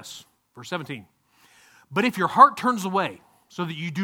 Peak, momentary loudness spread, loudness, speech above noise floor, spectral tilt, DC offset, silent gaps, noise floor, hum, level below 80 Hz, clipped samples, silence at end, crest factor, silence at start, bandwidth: 0 dBFS; 25 LU; -22 LUFS; 35 dB; -5 dB/octave; under 0.1%; none; -58 dBFS; none; -72 dBFS; under 0.1%; 0 s; 24 dB; 0 s; 17.5 kHz